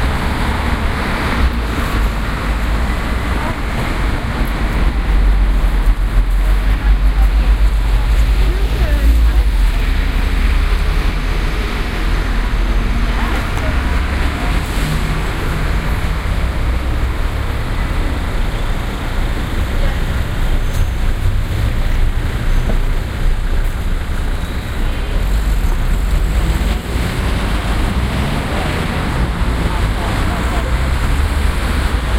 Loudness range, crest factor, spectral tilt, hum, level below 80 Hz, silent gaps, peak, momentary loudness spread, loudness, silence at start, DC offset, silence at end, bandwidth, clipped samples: 4 LU; 14 dB; -6 dB/octave; none; -16 dBFS; none; 0 dBFS; 5 LU; -18 LUFS; 0 s; under 0.1%; 0 s; 15.5 kHz; under 0.1%